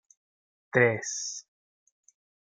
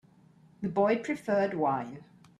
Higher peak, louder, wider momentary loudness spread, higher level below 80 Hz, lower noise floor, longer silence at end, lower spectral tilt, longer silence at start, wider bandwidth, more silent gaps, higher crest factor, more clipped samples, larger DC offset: first, -8 dBFS vs -14 dBFS; first, -27 LUFS vs -30 LUFS; about the same, 13 LU vs 13 LU; about the same, -70 dBFS vs -72 dBFS; first, under -90 dBFS vs -60 dBFS; first, 1.05 s vs 0.35 s; second, -4 dB/octave vs -7 dB/octave; first, 0.75 s vs 0.6 s; second, 9.6 kHz vs 12.5 kHz; neither; first, 24 dB vs 18 dB; neither; neither